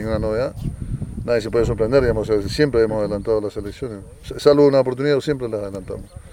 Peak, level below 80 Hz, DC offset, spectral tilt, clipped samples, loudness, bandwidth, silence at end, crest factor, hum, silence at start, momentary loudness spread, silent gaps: -2 dBFS; -36 dBFS; under 0.1%; -7 dB/octave; under 0.1%; -20 LUFS; 13.5 kHz; 0 s; 18 dB; none; 0 s; 16 LU; none